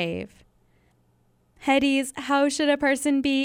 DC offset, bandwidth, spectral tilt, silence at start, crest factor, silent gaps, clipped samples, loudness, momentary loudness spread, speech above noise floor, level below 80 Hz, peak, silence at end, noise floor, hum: under 0.1%; 15.5 kHz; -3.5 dB/octave; 0 s; 16 dB; none; under 0.1%; -23 LUFS; 11 LU; 41 dB; -58 dBFS; -8 dBFS; 0 s; -64 dBFS; none